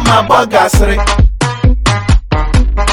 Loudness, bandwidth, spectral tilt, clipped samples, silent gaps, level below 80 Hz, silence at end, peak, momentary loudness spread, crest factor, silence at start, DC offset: -11 LUFS; 17.5 kHz; -5 dB/octave; under 0.1%; none; -12 dBFS; 0 s; 0 dBFS; 4 LU; 10 dB; 0 s; under 0.1%